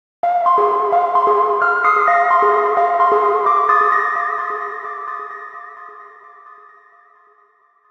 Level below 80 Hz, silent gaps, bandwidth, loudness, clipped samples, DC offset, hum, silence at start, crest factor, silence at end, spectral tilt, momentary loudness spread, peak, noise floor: -70 dBFS; none; 7.4 kHz; -15 LUFS; under 0.1%; under 0.1%; none; 0.25 s; 16 dB; 1.4 s; -4.5 dB/octave; 16 LU; -2 dBFS; -56 dBFS